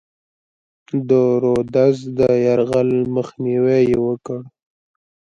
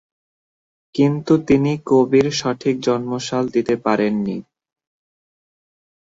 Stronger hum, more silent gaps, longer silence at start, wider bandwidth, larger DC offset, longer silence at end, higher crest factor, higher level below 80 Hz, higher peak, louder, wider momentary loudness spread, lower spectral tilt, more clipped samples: neither; neither; about the same, 0.95 s vs 0.95 s; about the same, 7.8 kHz vs 7.8 kHz; neither; second, 0.75 s vs 1.75 s; about the same, 16 dB vs 18 dB; about the same, -52 dBFS vs -56 dBFS; about the same, -2 dBFS vs -2 dBFS; about the same, -17 LUFS vs -18 LUFS; about the same, 10 LU vs 8 LU; first, -8.5 dB/octave vs -6 dB/octave; neither